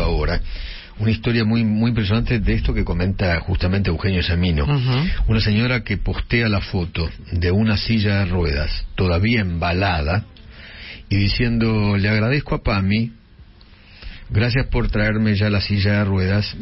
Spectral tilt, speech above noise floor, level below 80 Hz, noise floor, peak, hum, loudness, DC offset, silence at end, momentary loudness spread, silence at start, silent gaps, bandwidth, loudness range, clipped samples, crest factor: -10.5 dB/octave; 27 dB; -28 dBFS; -45 dBFS; -6 dBFS; none; -20 LUFS; under 0.1%; 0 s; 7 LU; 0 s; none; 5.8 kHz; 2 LU; under 0.1%; 12 dB